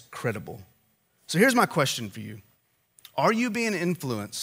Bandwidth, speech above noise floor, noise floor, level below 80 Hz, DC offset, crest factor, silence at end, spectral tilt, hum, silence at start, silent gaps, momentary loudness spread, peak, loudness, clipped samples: 16 kHz; 42 dB; -68 dBFS; -70 dBFS; under 0.1%; 22 dB; 0 s; -4.5 dB/octave; none; 0.1 s; none; 20 LU; -6 dBFS; -25 LUFS; under 0.1%